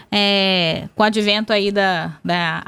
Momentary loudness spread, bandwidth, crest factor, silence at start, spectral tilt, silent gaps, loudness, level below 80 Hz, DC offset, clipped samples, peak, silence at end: 6 LU; 13.5 kHz; 16 dB; 0.1 s; -5 dB/octave; none; -17 LUFS; -54 dBFS; under 0.1%; under 0.1%; -2 dBFS; 0.05 s